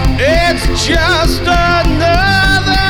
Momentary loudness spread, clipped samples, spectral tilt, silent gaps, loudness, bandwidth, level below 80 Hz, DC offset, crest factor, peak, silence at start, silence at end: 3 LU; under 0.1%; -4.5 dB/octave; none; -11 LUFS; over 20 kHz; -18 dBFS; under 0.1%; 10 dB; 0 dBFS; 0 s; 0 s